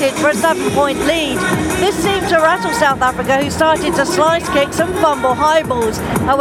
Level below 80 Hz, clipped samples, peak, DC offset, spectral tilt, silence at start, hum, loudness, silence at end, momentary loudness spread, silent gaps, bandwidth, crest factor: -36 dBFS; under 0.1%; 0 dBFS; under 0.1%; -4 dB/octave; 0 s; none; -14 LUFS; 0 s; 3 LU; none; 17.5 kHz; 14 dB